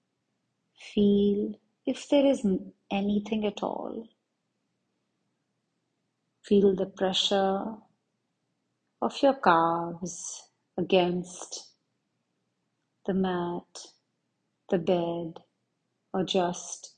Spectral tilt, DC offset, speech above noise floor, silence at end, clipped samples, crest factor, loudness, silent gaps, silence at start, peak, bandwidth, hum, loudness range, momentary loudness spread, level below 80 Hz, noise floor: -5 dB/octave; under 0.1%; 52 dB; 0.1 s; under 0.1%; 22 dB; -28 LUFS; none; 0.8 s; -8 dBFS; 9.6 kHz; none; 7 LU; 16 LU; -64 dBFS; -79 dBFS